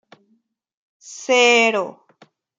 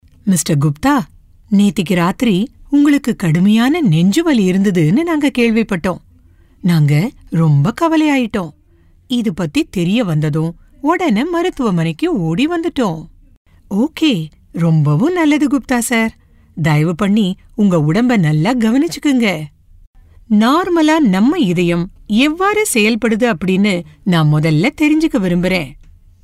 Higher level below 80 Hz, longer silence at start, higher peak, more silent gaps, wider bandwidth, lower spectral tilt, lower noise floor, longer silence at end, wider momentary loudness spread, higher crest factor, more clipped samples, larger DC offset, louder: second, -76 dBFS vs -42 dBFS; first, 1.05 s vs 0.25 s; about the same, -2 dBFS vs -2 dBFS; second, none vs 13.37-13.45 s, 19.87-19.94 s; second, 9.4 kHz vs 15.5 kHz; second, -1.5 dB/octave vs -6 dB/octave; first, -65 dBFS vs -49 dBFS; first, 0.7 s vs 0.5 s; first, 20 LU vs 7 LU; first, 20 dB vs 12 dB; neither; neither; about the same, -15 LUFS vs -14 LUFS